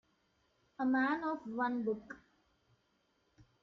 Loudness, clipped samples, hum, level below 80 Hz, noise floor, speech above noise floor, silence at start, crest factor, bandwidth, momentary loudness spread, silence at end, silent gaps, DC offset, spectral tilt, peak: -36 LUFS; under 0.1%; none; -78 dBFS; -77 dBFS; 42 dB; 0.8 s; 16 dB; 6.2 kHz; 15 LU; 1.45 s; none; under 0.1%; -7 dB/octave; -24 dBFS